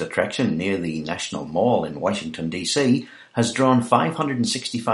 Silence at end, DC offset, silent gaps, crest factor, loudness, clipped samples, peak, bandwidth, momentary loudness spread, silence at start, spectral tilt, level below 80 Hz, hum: 0 s; under 0.1%; none; 20 dB; -22 LUFS; under 0.1%; -2 dBFS; 11.5 kHz; 9 LU; 0 s; -5 dB/octave; -58 dBFS; none